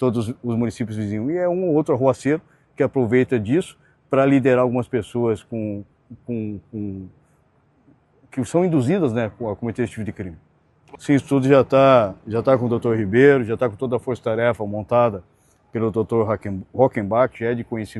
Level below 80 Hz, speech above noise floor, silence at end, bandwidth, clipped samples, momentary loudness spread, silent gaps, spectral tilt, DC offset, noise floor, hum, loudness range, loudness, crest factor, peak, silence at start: -56 dBFS; 40 dB; 0 s; 12 kHz; under 0.1%; 15 LU; none; -7.5 dB/octave; under 0.1%; -60 dBFS; none; 7 LU; -20 LUFS; 20 dB; 0 dBFS; 0 s